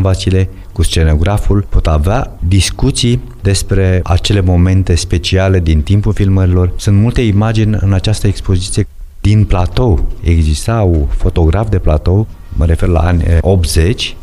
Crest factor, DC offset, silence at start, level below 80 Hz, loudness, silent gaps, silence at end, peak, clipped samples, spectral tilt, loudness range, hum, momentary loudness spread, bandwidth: 10 dB; under 0.1%; 0 s; -16 dBFS; -12 LUFS; none; 0 s; 0 dBFS; under 0.1%; -6 dB/octave; 2 LU; none; 4 LU; 12.5 kHz